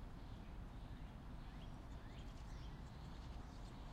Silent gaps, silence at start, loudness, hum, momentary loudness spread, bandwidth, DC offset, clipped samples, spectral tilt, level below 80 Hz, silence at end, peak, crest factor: none; 0 s; -55 LUFS; none; 1 LU; 15 kHz; under 0.1%; under 0.1%; -6.5 dB/octave; -54 dBFS; 0 s; -42 dBFS; 12 dB